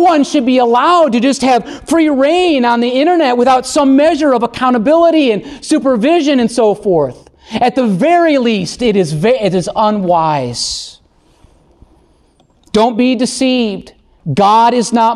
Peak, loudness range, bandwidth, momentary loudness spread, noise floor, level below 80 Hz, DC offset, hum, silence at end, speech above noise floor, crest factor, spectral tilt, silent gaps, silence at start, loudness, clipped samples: -2 dBFS; 6 LU; 12.5 kHz; 7 LU; -51 dBFS; -46 dBFS; under 0.1%; none; 0 s; 40 dB; 10 dB; -5 dB/octave; none; 0 s; -11 LUFS; under 0.1%